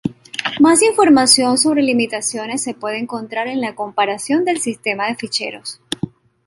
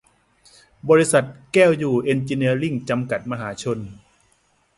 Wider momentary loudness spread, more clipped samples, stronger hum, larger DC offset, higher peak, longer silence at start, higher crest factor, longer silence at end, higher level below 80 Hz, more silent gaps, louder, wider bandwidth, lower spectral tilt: about the same, 14 LU vs 12 LU; neither; neither; neither; about the same, 0 dBFS vs -2 dBFS; second, 0.05 s vs 0.85 s; about the same, 18 dB vs 18 dB; second, 0.4 s vs 0.85 s; about the same, -58 dBFS vs -58 dBFS; neither; first, -16 LUFS vs -20 LUFS; first, 15.5 kHz vs 11.5 kHz; second, -2.5 dB/octave vs -5.5 dB/octave